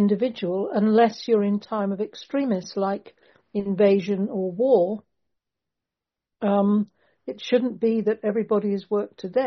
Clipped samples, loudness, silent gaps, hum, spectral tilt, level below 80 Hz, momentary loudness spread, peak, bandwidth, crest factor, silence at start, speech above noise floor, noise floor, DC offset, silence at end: under 0.1%; -23 LUFS; none; none; -6.5 dB/octave; -70 dBFS; 11 LU; -6 dBFS; 6.4 kHz; 18 dB; 0 s; 65 dB; -88 dBFS; under 0.1%; 0 s